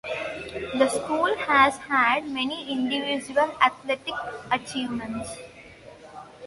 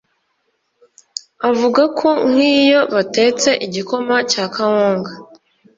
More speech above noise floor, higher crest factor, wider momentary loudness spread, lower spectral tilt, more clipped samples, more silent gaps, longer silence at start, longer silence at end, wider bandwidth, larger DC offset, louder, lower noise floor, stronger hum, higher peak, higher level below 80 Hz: second, 22 dB vs 52 dB; first, 24 dB vs 14 dB; first, 15 LU vs 10 LU; about the same, -3 dB/octave vs -3.5 dB/octave; neither; neither; second, 0.05 s vs 1.4 s; second, 0 s vs 0.55 s; first, 11.5 kHz vs 7.8 kHz; neither; second, -25 LUFS vs -15 LUFS; second, -47 dBFS vs -67 dBFS; neither; about the same, -2 dBFS vs -2 dBFS; about the same, -58 dBFS vs -62 dBFS